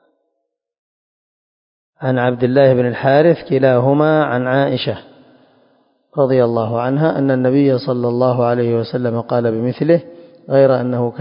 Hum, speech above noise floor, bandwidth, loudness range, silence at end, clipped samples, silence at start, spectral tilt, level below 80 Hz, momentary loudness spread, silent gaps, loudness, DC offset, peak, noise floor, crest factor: none; 60 dB; 5.4 kHz; 3 LU; 0 s; under 0.1%; 2 s; -12.5 dB/octave; -58 dBFS; 7 LU; none; -15 LUFS; under 0.1%; 0 dBFS; -74 dBFS; 16 dB